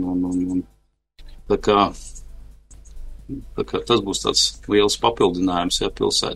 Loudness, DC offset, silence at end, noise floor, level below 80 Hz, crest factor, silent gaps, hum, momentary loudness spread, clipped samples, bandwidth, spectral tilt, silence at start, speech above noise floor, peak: -20 LUFS; under 0.1%; 0 s; -51 dBFS; -40 dBFS; 20 dB; none; none; 14 LU; under 0.1%; 12.5 kHz; -3.5 dB/octave; 0 s; 31 dB; -2 dBFS